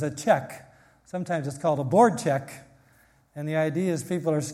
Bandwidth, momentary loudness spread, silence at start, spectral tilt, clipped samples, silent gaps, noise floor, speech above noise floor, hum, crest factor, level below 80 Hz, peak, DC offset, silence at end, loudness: 15.5 kHz; 22 LU; 0 s; -6 dB/octave; under 0.1%; none; -60 dBFS; 35 dB; none; 20 dB; -68 dBFS; -6 dBFS; under 0.1%; 0 s; -25 LUFS